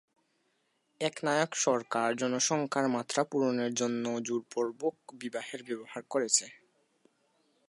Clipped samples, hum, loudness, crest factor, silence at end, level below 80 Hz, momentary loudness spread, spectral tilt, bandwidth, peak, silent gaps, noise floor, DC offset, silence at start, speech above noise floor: under 0.1%; none; -31 LUFS; 22 dB; 1.15 s; -84 dBFS; 11 LU; -3 dB/octave; 11.5 kHz; -10 dBFS; none; -76 dBFS; under 0.1%; 1 s; 44 dB